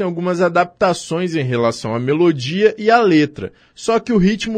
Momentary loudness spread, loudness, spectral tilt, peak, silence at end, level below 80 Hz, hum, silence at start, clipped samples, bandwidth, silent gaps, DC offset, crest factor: 8 LU; -16 LUFS; -6 dB/octave; 0 dBFS; 0 s; -46 dBFS; none; 0 s; under 0.1%; 10 kHz; none; under 0.1%; 16 dB